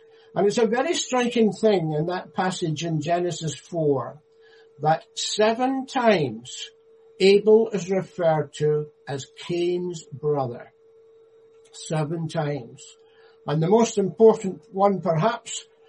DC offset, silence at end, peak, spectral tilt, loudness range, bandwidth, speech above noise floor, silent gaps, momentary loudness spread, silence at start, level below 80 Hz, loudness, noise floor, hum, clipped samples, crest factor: under 0.1%; 0.25 s; -4 dBFS; -5.5 dB/octave; 8 LU; 10.5 kHz; 31 dB; none; 15 LU; 0.35 s; -68 dBFS; -23 LUFS; -54 dBFS; none; under 0.1%; 20 dB